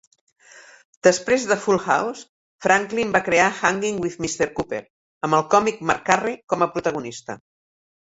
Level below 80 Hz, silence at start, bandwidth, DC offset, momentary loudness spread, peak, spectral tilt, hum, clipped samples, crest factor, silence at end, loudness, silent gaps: -58 dBFS; 0.55 s; 8.2 kHz; under 0.1%; 13 LU; 0 dBFS; -4 dB/octave; none; under 0.1%; 22 dB; 0.75 s; -21 LUFS; 0.85-1.01 s, 2.29-2.59 s, 4.90-5.21 s